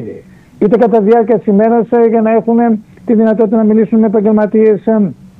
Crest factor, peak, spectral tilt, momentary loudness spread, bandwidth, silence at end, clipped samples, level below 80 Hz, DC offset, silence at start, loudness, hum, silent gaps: 10 dB; 0 dBFS; -10.5 dB/octave; 5 LU; 3.8 kHz; 0.15 s; under 0.1%; -52 dBFS; under 0.1%; 0 s; -10 LUFS; none; none